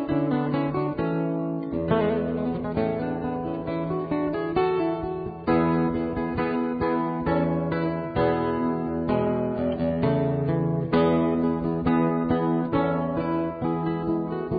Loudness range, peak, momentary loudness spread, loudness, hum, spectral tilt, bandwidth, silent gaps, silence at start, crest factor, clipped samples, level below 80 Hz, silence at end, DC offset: 3 LU; -8 dBFS; 5 LU; -25 LUFS; none; -12.5 dB/octave; 4.9 kHz; none; 0 s; 16 dB; under 0.1%; -46 dBFS; 0 s; under 0.1%